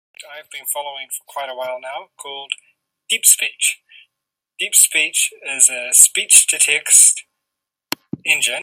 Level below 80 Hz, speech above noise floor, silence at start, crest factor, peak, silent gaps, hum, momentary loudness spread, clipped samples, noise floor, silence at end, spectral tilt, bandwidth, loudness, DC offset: -72 dBFS; 65 dB; 0.2 s; 18 dB; 0 dBFS; none; none; 20 LU; 0.1%; -81 dBFS; 0 s; 2 dB/octave; over 20 kHz; -12 LUFS; under 0.1%